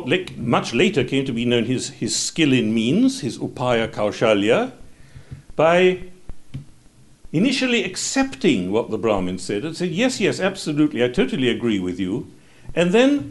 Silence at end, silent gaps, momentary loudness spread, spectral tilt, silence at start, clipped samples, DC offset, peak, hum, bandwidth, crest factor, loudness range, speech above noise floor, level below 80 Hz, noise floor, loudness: 0 s; none; 10 LU; -4.5 dB/octave; 0 s; under 0.1%; 0.2%; -4 dBFS; none; 11.5 kHz; 16 dB; 2 LU; 30 dB; -46 dBFS; -49 dBFS; -20 LUFS